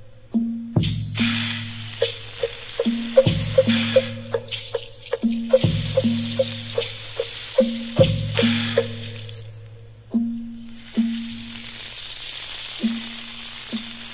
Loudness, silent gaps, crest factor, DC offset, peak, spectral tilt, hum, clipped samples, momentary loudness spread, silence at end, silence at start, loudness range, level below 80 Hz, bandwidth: -24 LUFS; none; 22 dB; under 0.1%; -2 dBFS; -10.5 dB/octave; 60 Hz at -50 dBFS; under 0.1%; 15 LU; 0 s; 0 s; 8 LU; -46 dBFS; 4 kHz